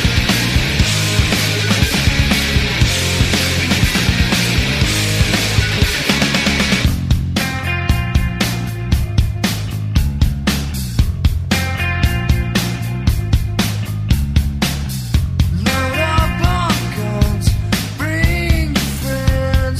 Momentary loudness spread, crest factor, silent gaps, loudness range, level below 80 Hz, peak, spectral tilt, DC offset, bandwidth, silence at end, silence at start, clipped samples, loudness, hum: 5 LU; 14 dB; none; 4 LU; -22 dBFS; 0 dBFS; -4.5 dB/octave; under 0.1%; 16 kHz; 0 s; 0 s; under 0.1%; -16 LUFS; none